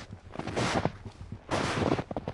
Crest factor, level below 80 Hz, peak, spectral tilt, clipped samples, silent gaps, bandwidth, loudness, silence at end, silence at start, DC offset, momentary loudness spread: 22 dB; -52 dBFS; -10 dBFS; -5 dB/octave; under 0.1%; none; 11.5 kHz; -31 LUFS; 0 s; 0 s; under 0.1%; 16 LU